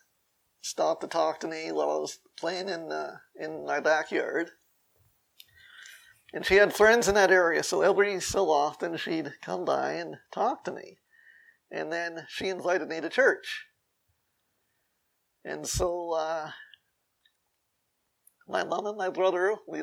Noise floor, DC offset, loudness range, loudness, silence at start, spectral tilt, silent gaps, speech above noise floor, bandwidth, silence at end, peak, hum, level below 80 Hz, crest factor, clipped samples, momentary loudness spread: -78 dBFS; under 0.1%; 12 LU; -28 LUFS; 0.65 s; -3 dB/octave; none; 50 dB; 17 kHz; 0 s; -6 dBFS; none; -56 dBFS; 22 dB; under 0.1%; 17 LU